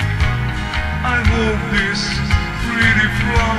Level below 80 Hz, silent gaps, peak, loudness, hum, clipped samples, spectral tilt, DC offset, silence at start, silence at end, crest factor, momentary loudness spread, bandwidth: -24 dBFS; none; 0 dBFS; -17 LUFS; none; under 0.1%; -5 dB/octave; under 0.1%; 0 s; 0 s; 16 dB; 7 LU; 13.5 kHz